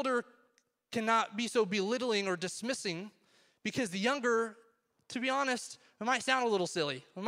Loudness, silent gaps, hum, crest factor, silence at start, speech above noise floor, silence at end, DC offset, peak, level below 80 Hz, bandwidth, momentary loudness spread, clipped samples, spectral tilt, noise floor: -33 LUFS; none; none; 22 dB; 0 s; 40 dB; 0 s; under 0.1%; -12 dBFS; -80 dBFS; 15.5 kHz; 10 LU; under 0.1%; -3.5 dB/octave; -74 dBFS